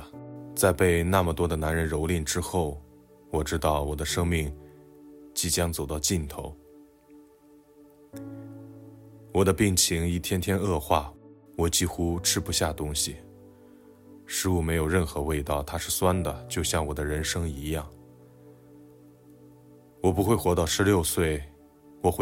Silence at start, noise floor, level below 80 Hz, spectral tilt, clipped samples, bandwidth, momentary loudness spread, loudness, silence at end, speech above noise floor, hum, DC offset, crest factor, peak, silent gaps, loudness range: 0 s; -56 dBFS; -44 dBFS; -4.5 dB/octave; under 0.1%; 16.5 kHz; 19 LU; -27 LUFS; 0 s; 30 dB; none; under 0.1%; 22 dB; -8 dBFS; none; 6 LU